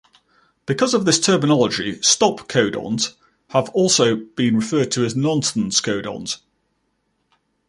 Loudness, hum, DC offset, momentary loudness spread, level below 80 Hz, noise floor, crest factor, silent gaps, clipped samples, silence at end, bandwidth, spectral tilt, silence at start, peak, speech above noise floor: -19 LUFS; none; under 0.1%; 10 LU; -58 dBFS; -69 dBFS; 18 dB; none; under 0.1%; 1.3 s; 11.5 kHz; -3.5 dB/octave; 0.7 s; -2 dBFS; 50 dB